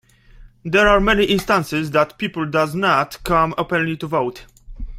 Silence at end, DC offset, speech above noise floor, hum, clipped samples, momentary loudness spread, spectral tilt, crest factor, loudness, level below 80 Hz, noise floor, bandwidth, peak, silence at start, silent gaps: 0 s; under 0.1%; 27 dB; none; under 0.1%; 8 LU; -5.5 dB/octave; 18 dB; -18 LUFS; -36 dBFS; -45 dBFS; 16 kHz; 0 dBFS; 0.4 s; none